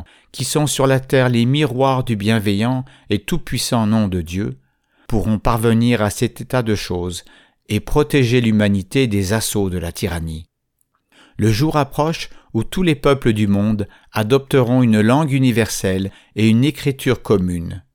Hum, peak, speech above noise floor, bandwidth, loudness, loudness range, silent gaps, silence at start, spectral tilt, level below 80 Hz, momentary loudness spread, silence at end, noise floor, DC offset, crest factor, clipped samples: none; -2 dBFS; 50 dB; 19 kHz; -18 LUFS; 4 LU; none; 0 s; -6 dB/octave; -36 dBFS; 10 LU; 0.15 s; -67 dBFS; under 0.1%; 14 dB; under 0.1%